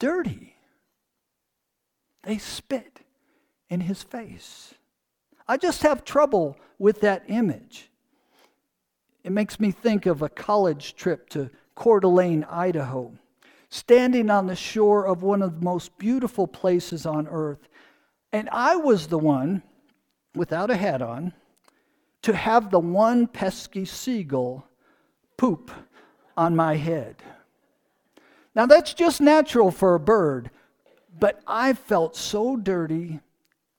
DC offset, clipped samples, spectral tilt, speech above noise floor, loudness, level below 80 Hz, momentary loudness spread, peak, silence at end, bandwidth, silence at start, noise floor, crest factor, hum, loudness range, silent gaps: under 0.1%; under 0.1%; -6 dB/octave; 58 dB; -23 LUFS; -58 dBFS; 15 LU; 0 dBFS; 0.6 s; 19 kHz; 0 s; -80 dBFS; 24 dB; none; 9 LU; none